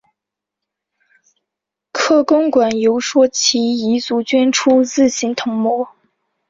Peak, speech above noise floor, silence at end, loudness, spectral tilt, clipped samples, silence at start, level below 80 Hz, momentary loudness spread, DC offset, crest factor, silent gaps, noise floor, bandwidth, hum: -2 dBFS; 69 dB; 0.6 s; -15 LUFS; -3 dB/octave; under 0.1%; 1.95 s; -60 dBFS; 7 LU; under 0.1%; 14 dB; none; -83 dBFS; 7.8 kHz; none